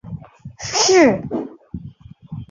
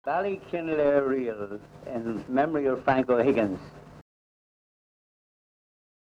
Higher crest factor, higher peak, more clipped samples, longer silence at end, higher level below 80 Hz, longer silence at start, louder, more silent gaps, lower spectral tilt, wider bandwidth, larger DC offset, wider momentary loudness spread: about the same, 18 dB vs 18 dB; first, -2 dBFS vs -10 dBFS; neither; second, 0.05 s vs 2.2 s; first, -48 dBFS vs -60 dBFS; about the same, 0.05 s vs 0.05 s; first, -16 LUFS vs -27 LUFS; neither; second, -3.5 dB/octave vs -8 dB/octave; second, 7.4 kHz vs 8.6 kHz; neither; first, 23 LU vs 15 LU